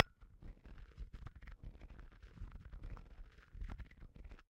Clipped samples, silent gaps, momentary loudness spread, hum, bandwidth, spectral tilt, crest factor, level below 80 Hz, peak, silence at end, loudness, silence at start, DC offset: under 0.1%; none; 8 LU; none; 7.6 kHz; -7 dB/octave; 40 dB; -54 dBFS; -8 dBFS; 0.1 s; -53 LUFS; 0 s; under 0.1%